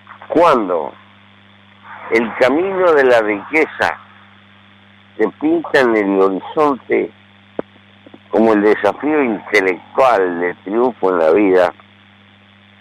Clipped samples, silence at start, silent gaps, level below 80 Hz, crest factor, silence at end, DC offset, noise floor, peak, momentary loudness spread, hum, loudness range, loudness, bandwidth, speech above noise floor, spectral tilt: under 0.1%; 0.1 s; none; -58 dBFS; 14 dB; 1.1 s; under 0.1%; -46 dBFS; -2 dBFS; 9 LU; none; 2 LU; -15 LUFS; 12 kHz; 32 dB; -6 dB/octave